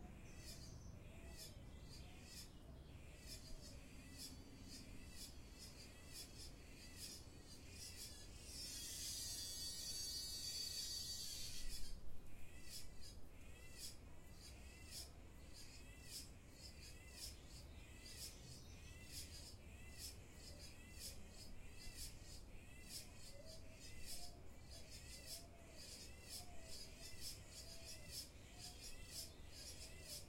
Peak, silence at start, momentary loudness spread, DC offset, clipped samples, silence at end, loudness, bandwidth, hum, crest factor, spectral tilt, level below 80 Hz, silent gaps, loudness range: -34 dBFS; 0 s; 13 LU; under 0.1%; under 0.1%; 0 s; -54 LUFS; 16.5 kHz; none; 20 dB; -2 dB/octave; -62 dBFS; none; 10 LU